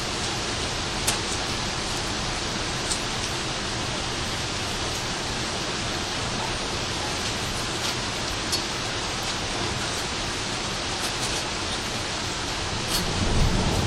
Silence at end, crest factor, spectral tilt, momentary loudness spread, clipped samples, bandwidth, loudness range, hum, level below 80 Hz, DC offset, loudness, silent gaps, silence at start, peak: 0 s; 22 dB; -3 dB/octave; 3 LU; under 0.1%; 16 kHz; 1 LU; none; -38 dBFS; under 0.1%; -26 LUFS; none; 0 s; -6 dBFS